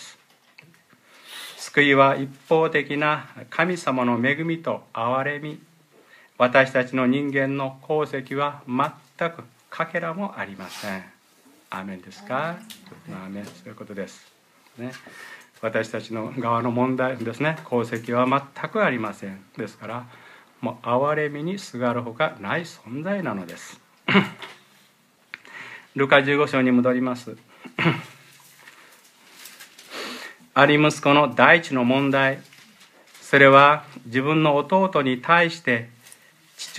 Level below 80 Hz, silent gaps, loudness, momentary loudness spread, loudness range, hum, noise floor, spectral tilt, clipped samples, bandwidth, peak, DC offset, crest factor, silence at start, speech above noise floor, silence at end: -72 dBFS; none; -21 LUFS; 21 LU; 14 LU; none; -59 dBFS; -5.5 dB/octave; under 0.1%; 15 kHz; 0 dBFS; under 0.1%; 24 dB; 0 s; 37 dB; 0 s